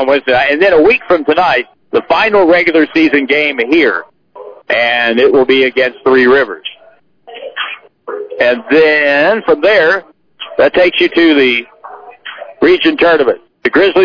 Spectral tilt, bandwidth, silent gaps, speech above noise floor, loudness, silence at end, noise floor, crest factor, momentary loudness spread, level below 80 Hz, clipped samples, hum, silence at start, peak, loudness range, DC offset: -5.5 dB/octave; 5.4 kHz; none; 36 dB; -10 LUFS; 0 s; -46 dBFS; 10 dB; 16 LU; -48 dBFS; under 0.1%; none; 0 s; 0 dBFS; 3 LU; under 0.1%